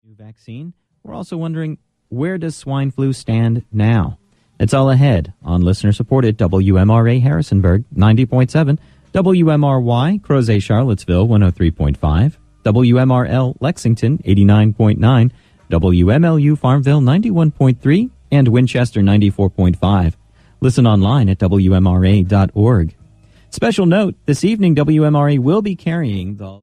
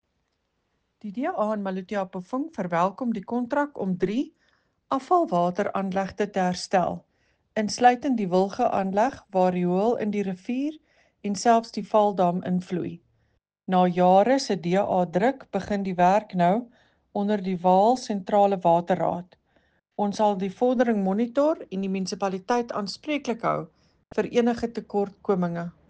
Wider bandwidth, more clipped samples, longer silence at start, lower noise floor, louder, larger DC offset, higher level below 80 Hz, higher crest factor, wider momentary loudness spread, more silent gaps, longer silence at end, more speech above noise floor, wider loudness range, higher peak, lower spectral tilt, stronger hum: first, 11 kHz vs 9.4 kHz; neither; second, 0.25 s vs 1.05 s; second, -46 dBFS vs -75 dBFS; first, -14 LUFS vs -25 LUFS; neither; first, -32 dBFS vs -62 dBFS; second, 12 dB vs 20 dB; about the same, 10 LU vs 10 LU; neither; second, 0.05 s vs 0.2 s; second, 33 dB vs 51 dB; about the same, 3 LU vs 5 LU; first, 0 dBFS vs -6 dBFS; first, -8 dB/octave vs -6.5 dB/octave; neither